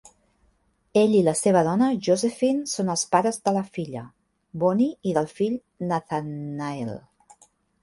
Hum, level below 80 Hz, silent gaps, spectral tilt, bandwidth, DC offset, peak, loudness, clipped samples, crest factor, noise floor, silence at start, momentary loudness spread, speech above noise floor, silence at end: none; -64 dBFS; none; -5.5 dB/octave; 12 kHz; under 0.1%; -4 dBFS; -24 LUFS; under 0.1%; 20 dB; -66 dBFS; 0.95 s; 13 LU; 43 dB; 0.85 s